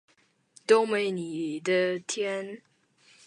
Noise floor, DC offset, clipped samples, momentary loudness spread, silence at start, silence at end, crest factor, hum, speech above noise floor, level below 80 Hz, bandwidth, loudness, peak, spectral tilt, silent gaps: -62 dBFS; under 0.1%; under 0.1%; 17 LU; 0.7 s; 0.7 s; 20 dB; none; 35 dB; -82 dBFS; 10.5 kHz; -27 LUFS; -8 dBFS; -4 dB/octave; none